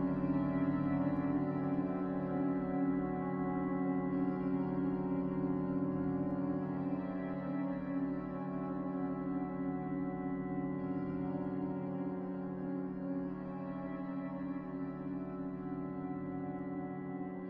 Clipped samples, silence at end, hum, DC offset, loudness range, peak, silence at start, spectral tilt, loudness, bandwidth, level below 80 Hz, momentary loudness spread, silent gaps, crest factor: under 0.1%; 0 s; none; under 0.1%; 6 LU; -22 dBFS; 0 s; -9.5 dB/octave; -38 LUFS; 4.2 kHz; -62 dBFS; 7 LU; none; 14 dB